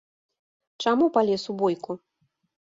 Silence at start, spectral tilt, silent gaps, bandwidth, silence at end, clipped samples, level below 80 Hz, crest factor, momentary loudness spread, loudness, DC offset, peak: 0.8 s; -5.5 dB/octave; none; 7.8 kHz; 0.7 s; under 0.1%; -70 dBFS; 18 dB; 14 LU; -24 LUFS; under 0.1%; -8 dBFS